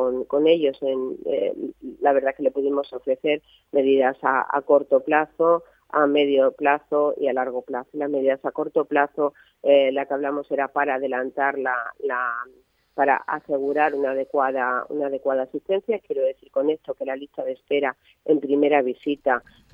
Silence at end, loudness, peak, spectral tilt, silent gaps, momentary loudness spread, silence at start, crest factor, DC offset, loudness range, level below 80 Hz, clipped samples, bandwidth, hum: 0.35 s; -23 LUFS; -4 dBFS; -7 dB/octave; none; 8 LU; 0 s; 20 dB; under 0.1%; 4 LU; -68 dBFS; under 0.1%; 4.7 kHz; none